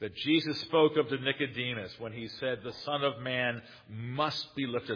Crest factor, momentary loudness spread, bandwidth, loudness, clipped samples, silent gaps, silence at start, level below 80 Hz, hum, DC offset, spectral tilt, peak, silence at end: 20 dB; 14 LU; 5.4 kHz; -31 LUFS; under 0.1%; none; 0 s; -70 dBFS; none; under 0.1%; -6 dB/octave; -12 dBFS; 0 s